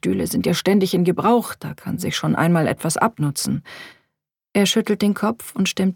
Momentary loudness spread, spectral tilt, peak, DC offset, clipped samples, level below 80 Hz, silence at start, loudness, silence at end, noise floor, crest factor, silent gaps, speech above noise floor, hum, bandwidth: 10 LU; -5 dB/octave; -4 dBFS; under 0.1%; under 0.1%; -56 dBFS; 0.05 s; -20 LUFS; 0 s; -77 dBFS; 18 dB; none; 58 dB; none; 18.5 kHz